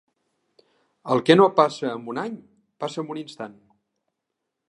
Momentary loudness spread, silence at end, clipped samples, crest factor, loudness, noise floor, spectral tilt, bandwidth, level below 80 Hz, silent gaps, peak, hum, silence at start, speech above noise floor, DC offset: 22 LU; 1.2 s; under 0.1%; 24 dB; -22 LUFS; -81 dBFS; -6 dB/octave; 11 kHz; -76 dBFS; none; -2 dBFS; none; 1.05 s; 60 dB; under 0.1%